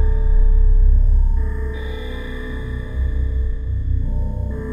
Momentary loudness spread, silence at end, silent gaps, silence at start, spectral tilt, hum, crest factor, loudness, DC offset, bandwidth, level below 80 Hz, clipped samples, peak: 11 LU; 0 s; none; 0 s; -8.5 dB/octave; none; 12 dB; -22 LUFS; under 0.1%; 3.8 kHz; -16 dBFS; under 0.1%; -4 dBFS